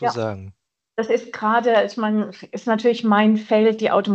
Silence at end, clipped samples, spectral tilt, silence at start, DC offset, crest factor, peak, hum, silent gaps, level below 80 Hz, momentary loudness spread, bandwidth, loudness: 0 s; under 0.1%; -6.5 dB/octave; 0 s; under 0.1%; 16 dB; -4 dBFS; none; none; -70 dBFS; 12 LU; 7.6 kHz; -20 LUFS